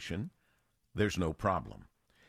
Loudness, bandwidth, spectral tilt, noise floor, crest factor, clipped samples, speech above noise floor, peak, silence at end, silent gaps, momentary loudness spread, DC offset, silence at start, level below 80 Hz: -35 LUFS; 14.5 kHz; -6 dB/octave; -75 dBFS; 20 dB; under 0.1%; 41 dB; -18 dBFS; 0.45 s; none; 17 LU; under 0.1%; 0 s; -54 dBFS